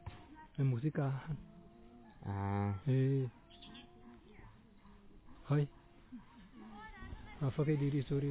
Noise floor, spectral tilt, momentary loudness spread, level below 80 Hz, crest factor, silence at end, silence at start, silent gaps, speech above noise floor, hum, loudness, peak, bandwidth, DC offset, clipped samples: -60 dBFS; -8.5 dB/octave; 25 LU; -60 dBFS; 16 dB; 0 s; 0 s; none; 25 dB; none; -37 LUFS; -24 dBFS; 4 kHz; under 0.1%; under 0.1%